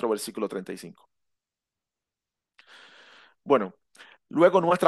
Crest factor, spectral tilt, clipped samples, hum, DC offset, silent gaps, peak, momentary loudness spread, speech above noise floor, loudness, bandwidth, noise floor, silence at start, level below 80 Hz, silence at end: 22 dB; -5.5 dB/octave; under 0.1%; none; under 0.1%; none; -4 dBFS; 21 LU; 66 dB; -25 LUFS; 12.5 kHz; -89 dBFS; 0 s; -76 dBFS; 0 s